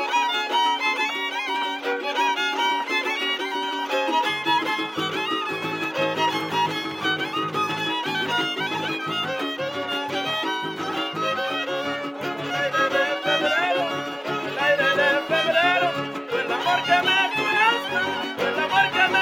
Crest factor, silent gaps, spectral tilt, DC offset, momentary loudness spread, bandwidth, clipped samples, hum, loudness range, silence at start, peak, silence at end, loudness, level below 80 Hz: 18 dB; none; -3 dB/octave; under 0.1%; 8 LU; 17 kHz; under 0.1%; none; 5 LU; 0 s; -6 dBFS; 0 s; -23 LUFS; -74 dBFS